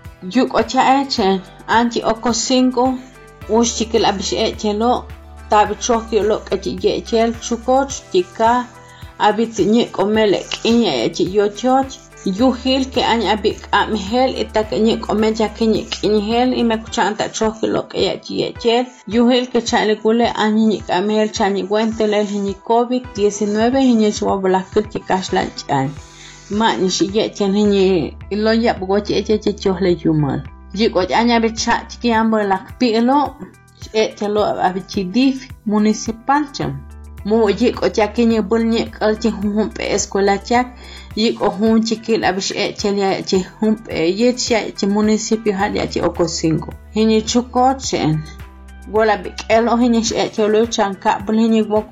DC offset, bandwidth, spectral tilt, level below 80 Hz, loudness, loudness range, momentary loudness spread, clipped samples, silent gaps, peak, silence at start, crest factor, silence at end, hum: under 0.1%; 8.8 kHz; -4.5 dB/octave; -40 dBFS; -17 LUFS; 2 LU; 6 LU; under 0.1%; none; -4 dBFS; 0.05 s; 14 dB; 0.05 s; none